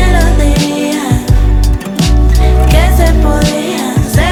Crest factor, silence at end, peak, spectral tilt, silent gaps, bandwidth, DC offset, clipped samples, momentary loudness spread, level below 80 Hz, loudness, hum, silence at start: 8 dB; 0 s; 0 dBFS; -5.5 dB/octave; none; 16.5 kHz; under 0.1%; 0.8%; 5 LU; -10 dBFS; -11 LUFS; none; 0 s